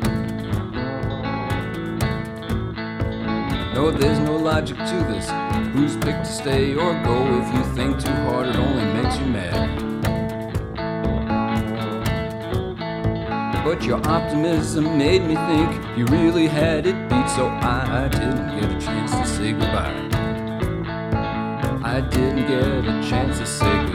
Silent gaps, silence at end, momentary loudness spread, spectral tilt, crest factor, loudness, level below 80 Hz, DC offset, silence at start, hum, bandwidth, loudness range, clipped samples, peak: none; 0 s; 7 LU; -6 dB/octave; 16 dB; -22 LUFS; -32 dBFS; under 0.1%; 0 s; none; 16 kHz; 5 LU; under 0.1%; -4 dBFS